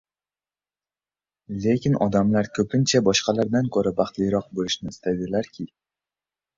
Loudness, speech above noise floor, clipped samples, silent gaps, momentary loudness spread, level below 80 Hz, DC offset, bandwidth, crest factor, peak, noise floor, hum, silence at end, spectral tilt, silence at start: -23 LUFS; over 68 dB; under 0.1%; none; 8 LU; -54 dBFS; under 0.1%; 7.6 kHz; 18 dB; -6 dBFS; under -90 dBFS; 50 Hz at -50 dBFS; 0.9 s; -5 dB/octave; 1.5 s